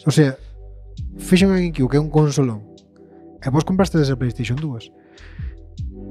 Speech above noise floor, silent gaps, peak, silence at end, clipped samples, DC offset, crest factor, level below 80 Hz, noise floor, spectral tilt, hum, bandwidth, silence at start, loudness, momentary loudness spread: 27 dB; none; -2 dBFS; 0 s; under 0.1%; under 0.1%; 18 dB; -36 dBFS; -46 dBFS; -6.5 dB/octave; none; 14 kHz; 0.05 s; -19 LUFS; 18 LU